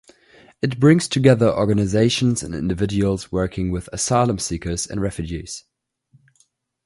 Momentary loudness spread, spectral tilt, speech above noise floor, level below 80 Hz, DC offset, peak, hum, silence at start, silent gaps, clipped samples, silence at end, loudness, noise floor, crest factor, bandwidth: 11 LU; -5.5 dB/octave; 44 dB; -40 dBFS; under 0.1%; 0 dBFS; none; 0.65 s; none; under 0.1%; 1.25 s; -20 LUFS; -63 dBFS; 20 dB; 11.5 kHz